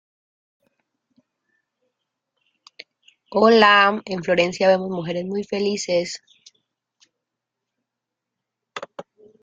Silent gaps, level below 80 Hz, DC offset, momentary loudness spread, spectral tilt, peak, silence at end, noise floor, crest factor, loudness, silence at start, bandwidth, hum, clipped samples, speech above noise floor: none; -66 dBFS; under 0.1%; 22 LU; -4 dB/octave; 0 dBFS; 0.4 s; -84 dBFS; 22 dB; -19 LUFS; 3.3 s; 9.2 kHz; none; under 0.1%; 65 dB